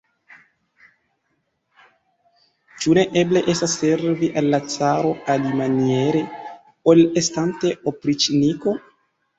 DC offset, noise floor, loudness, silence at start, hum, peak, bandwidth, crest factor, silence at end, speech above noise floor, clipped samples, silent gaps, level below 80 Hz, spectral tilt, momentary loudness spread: under 0.1%; -71 dBFS; -19 LUFS; 2.75 s; none; -2 dBFS; 8.2 kHz; 18 dB; 0.6 s; 52 dB; under 0.1%; none; -58 dBFS; -5 dB/octave; 8 LU